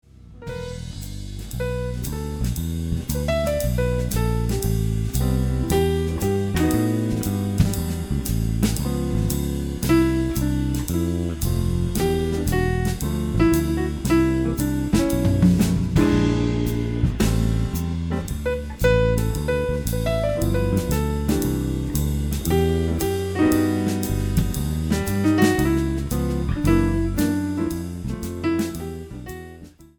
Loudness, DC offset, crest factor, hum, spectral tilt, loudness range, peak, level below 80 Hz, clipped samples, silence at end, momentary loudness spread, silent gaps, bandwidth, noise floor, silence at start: -22 LUFS; under 0.1%; 18 dB; none; -6.5 dB/octave; 4 LU; -4 dBFS; -30 dBFS; under 0.1%; 0.1 s; 8 LU; none; 19.5 kHz; -43 dBFS; 0.2 s